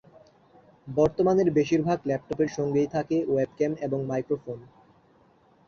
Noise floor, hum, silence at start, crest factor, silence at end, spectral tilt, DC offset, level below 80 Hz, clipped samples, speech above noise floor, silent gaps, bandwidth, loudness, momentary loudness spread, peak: -60 dBFS; none; 0.85 s; 18 dB; 1.05 s; -7.5 dB/octave; under 0.1%; -58 dBFS; under 0.1%; 35 dB; none; 7 kHz; -26 LUFS; 9 LU; -10 dBFS